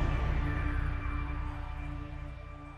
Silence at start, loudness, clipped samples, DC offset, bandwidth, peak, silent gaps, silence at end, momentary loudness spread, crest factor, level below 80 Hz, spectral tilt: 0 s; -37 LUFS; under 0.1%; under 0.1%; 6.4 kHz; -20 dBFS; none; 0 s; 11 LU; 14 dB; -36 dBFS; -8 dB/octave